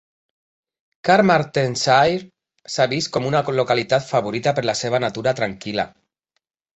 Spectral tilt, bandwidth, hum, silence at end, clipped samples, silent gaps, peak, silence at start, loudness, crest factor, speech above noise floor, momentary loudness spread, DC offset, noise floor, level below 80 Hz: -4.5 dB/octave; 8.2 kHz; none; 0.85 s; under 0.1%; none; -2 dBFS; 1.05 s; -20 LUFS; 18 dB; 56 dB; 10 LU; under 0.1%; -75 dBFS; -56 dBFS